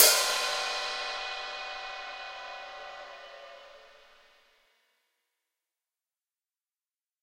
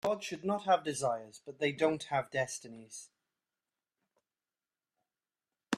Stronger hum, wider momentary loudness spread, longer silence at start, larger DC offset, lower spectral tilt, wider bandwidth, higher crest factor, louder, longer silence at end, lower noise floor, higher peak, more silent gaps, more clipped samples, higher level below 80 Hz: neither; first, 21 LU vs 18 LU; about the same, 0 s vs 0.05 s; neither; second, 3 dB/octave vs -4 dB/octave; first, 16 kHz vs 14 kHz; first, 32 dB vs 22 dB; first, -30 LUFS vs -34 LUFS; first, 3.35 s vs 0 s; about the same, under -90 dBFS vs under -90 dBFS; first, -2 dBFS vs -14 dBFS; neither; neither; first, -68 dBFS vs -76 dBFS